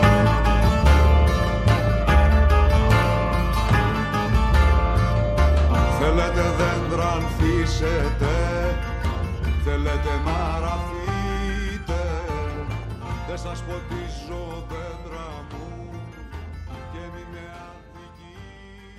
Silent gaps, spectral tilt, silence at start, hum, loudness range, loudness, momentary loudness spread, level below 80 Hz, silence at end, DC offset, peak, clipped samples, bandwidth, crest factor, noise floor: none; -6.5 dB/octave; 0 s; none; 17 LU; -22 LUFS; 18 LU; -24 dBFS; 0 s; under 0.1%; -4 dBFS; under 0.1%; 13.5 kHz; 18 dB; -44 dBFS